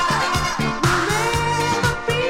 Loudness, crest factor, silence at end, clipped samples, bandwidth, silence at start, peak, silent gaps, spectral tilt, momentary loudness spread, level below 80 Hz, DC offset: -19 LUFS; 16 dB; 0 s; under 0.1%; 17 kHz; 0 s; -4 dBFS; none; -4 dB/octave; 2 LU; -36 dBFS; under 0.1%